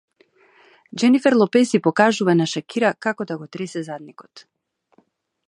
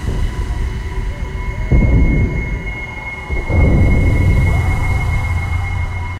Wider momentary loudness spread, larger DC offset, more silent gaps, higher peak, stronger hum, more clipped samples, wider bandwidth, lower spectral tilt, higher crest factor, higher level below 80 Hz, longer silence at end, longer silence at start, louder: first, 14 LU vs 11 LU; neither; neither; about the same, 0 dBFS vs -2 dBFS; neither; neither; about the same, 11 kHz vs 12 kHz; second, -5.5 dB/octave vs -7.5 dB/octave; first, 20 dB vs 12 dB; second, -72 dBFS vs -18 dBFS; first, 1.1 s vs 0 s; first, 0.95 s vs 0 s; about the same, -19 LUFS vs -17 LUFS